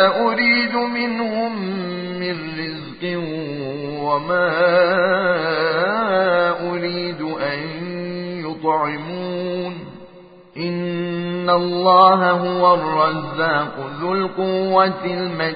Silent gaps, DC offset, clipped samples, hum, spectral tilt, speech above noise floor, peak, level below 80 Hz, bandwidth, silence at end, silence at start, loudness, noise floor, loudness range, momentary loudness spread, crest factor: none; under 0.1%; under 0.1%; none; -10.5 dB/octave; 27 dB; 0 dBFS; -62 dBFS; 5 kHz; 0 s; 0 s; -19 LUFS; -44 dBFS; 8 LU; 12 LU; 18 dB